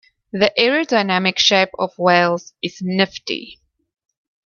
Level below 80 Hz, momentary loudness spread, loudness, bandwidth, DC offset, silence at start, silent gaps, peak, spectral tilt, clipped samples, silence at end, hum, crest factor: -60 dBFS; 12 LU; -17 LUFS; 7.2 kHz; under 0.1%; 0.35 s; none; 0 dBFS; -4 dB/octave; under 0.1%; 0.9 s; none; 18 dB